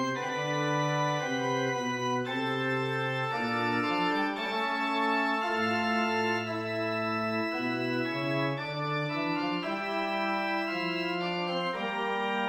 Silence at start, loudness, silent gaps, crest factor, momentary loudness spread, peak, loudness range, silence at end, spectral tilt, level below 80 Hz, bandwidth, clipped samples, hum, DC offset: 0 s; -30 LUFS; none; 14 dB; 4 LU; -16 dBFS; 2 LU; 0 s; -5 dB/octave; -72 dBFS; 16.5 kHz; under 0.1%; none; under 0.1%